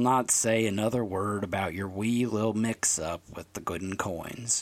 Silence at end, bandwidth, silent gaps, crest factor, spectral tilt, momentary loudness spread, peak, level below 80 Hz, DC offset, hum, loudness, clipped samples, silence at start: 0 s; 16.5 kHz; none; 18 dB; -4 dB/octave; 12 LU; -10 dBFS; -58 dBFS; under 0.1%; none; -28 LUFS; under 0.1%; 0 s